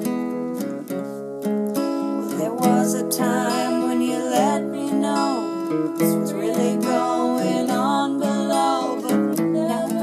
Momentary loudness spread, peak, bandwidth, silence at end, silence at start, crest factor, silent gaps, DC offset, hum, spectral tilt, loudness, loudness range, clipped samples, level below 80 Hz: 6 LU; -6 dBFS; 15.5 kHz; 0 s; 0 s; 16 dB; none; under 0.1%; none; -5 dB/octave; -22 LUFS; 2 LU; under 0.1%; -82 dBFS